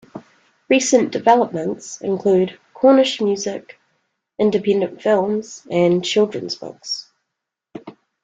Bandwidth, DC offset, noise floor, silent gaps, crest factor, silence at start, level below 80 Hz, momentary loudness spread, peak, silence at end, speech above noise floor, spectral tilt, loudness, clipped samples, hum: 9.4 kHz; under 0.1%; -81 dBFS; none; 18 dB; 0.15 s; -64 dBFS; 14 LU; -2 dBFS; 0.35 s; 63 dB; -4.5 dB/octave; -18 LUFS; under 0.1%; none